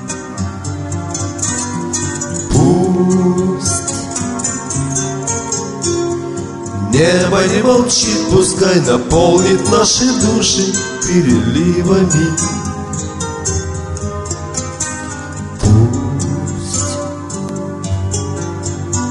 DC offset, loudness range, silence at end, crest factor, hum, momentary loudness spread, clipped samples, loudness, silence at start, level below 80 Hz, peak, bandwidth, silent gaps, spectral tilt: under 0.1%; 6 LU; 0 s; 14 dB; none; 11 LU; under 0.1%; -15 LUFS; 0 s; -34 dBFS; 0 dBFS; 11.5 kHz; none; -4.5 dB/octave